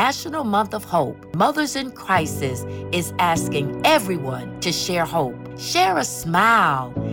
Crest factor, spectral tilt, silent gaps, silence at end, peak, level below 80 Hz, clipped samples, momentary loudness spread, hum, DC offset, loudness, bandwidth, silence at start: 16 dB; -4 dB/octave; none; 0 s; -6 dBFS; -50 dBFS; under 0.1%; 9 LU; none; under 0.1%; -21 LUFS; 19.5 kHz; 0 s